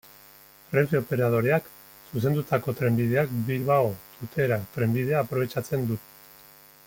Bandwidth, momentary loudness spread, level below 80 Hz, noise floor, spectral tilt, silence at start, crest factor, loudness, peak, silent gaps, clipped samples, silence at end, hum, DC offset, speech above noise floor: 17 kHz; 7 LU; -60 dBFS; -52 dBFS; -7.5 dB/octave; 0.7 s; 18 dB; -26 LUFS; -8 dBFS; none; under 0.1%; 0.85 s; none; under 0.1%; 27 dB